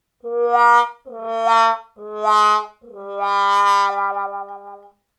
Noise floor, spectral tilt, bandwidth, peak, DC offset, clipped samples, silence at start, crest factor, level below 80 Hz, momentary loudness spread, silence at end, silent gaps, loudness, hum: -42 dBFS; -1 dB/octave; 13.5 kHz; -4 dBFS; under 0.1%; under 0.1%; 0.25 s; 16 dB; -74 dBFS; 19 LU; 0.4 s; none; -17 LUFS; none